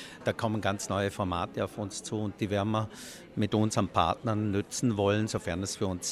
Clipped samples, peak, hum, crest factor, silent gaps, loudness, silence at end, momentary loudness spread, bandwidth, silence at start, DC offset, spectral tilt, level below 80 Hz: under 0.1%; -10 dBFS; none; 20 dB; none; -31 LUFS; 0 s; 7 LU; 14.5 kHz; 0 s; under 0.1%; -5 dB/octave; -58 dBFS